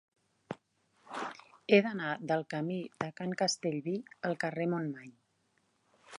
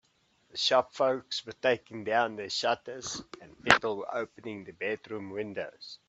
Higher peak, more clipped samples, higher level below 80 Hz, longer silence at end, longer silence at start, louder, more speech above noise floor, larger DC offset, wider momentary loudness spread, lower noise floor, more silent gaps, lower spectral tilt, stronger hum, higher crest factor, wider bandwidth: second, -12 dBFS vs 0 dBFS; neither; second, -82 dBFS vs -66 dBFS; second, 0 s vs 0.15 s; about the same, 0.5 s vs 0.55 s; second, -34 LUFS vs -30 LUFS; first, 42 dB vs 38 dB; neither; first, 20 LU vs 16 LU; first, -75 dBFS vs -69 dBFS; neither; first, -5 dB/octave vs -2.5 dB/octave; neither; second, 24 dB vs 32 dB; first, 11 kHz vs 9 kHz